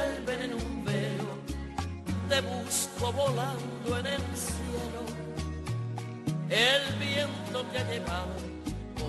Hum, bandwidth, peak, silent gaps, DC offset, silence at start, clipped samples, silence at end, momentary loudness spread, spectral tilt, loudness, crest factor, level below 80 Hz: none; 12.5 kHz; -12 dBFS; none; under 0.1%; 0 s; under 0.1%; 0 s; 10 LU; -4 dB/octave; -32 LUFS; 20 dB; -46 dBFS